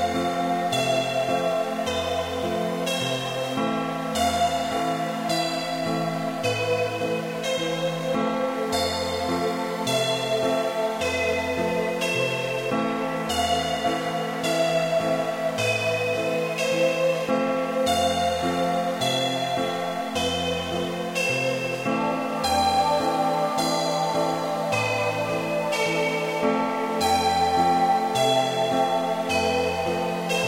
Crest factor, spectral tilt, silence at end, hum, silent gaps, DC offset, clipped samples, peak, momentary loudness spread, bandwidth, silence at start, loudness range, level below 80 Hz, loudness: 14 dB; -4 dB/octave; 0 s; none; none; under 0.1%; under 0.1%; -10 dBFS; 5 LU; 16 kHz; 0 s; 3 LU; -54 dBFS; -24 LUFS